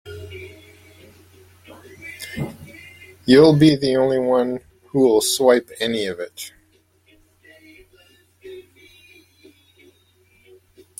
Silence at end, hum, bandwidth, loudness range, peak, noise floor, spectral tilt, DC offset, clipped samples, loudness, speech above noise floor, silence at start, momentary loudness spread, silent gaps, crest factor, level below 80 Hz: 2.4 s; none; 16.5 kHz; 18 LU; -2 dBFS; -59 dBFS; -5 dB/octave; under 0.1%; under 0.1%; -17 LUFS; 43 dB; 0.05 s; 28 LU; none; 20 dB; -56 dBFS